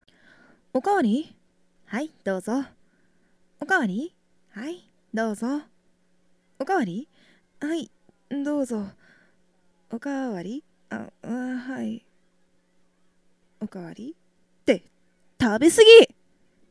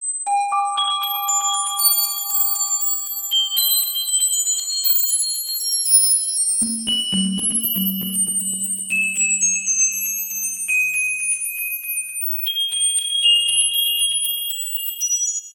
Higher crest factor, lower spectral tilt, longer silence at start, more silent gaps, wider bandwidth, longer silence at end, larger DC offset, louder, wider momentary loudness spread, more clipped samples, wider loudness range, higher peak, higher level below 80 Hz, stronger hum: first, 24 dB vs 18 dB; first, -4 dB/octave vs 1 dB/octave; first, 0.75 s vs 0 s; neither; second, 11 kHz vs 17.5 kHz; first, 0.65 s vs 0 s; neither; second, -22 LUFS vs -17 LUFS; first, 19 LU vs 7 LU; neither; first, 17 LU vs 2 LU; first, 0 dBFS vs -4 dBFS; about the same, -64 dBFS vs -66 dBFS; neither